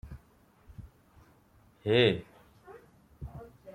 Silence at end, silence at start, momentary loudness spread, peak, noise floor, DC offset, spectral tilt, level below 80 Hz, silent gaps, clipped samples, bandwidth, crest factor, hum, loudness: 0.05 s; 0.05 s; 29 LU; -12 dBFS; -63 dBFS; under 0.1%; -7 dB/octave; -56 dBFS; none; under 0.1%; 14.5 kHz; 22 dB; none; -28 LUFS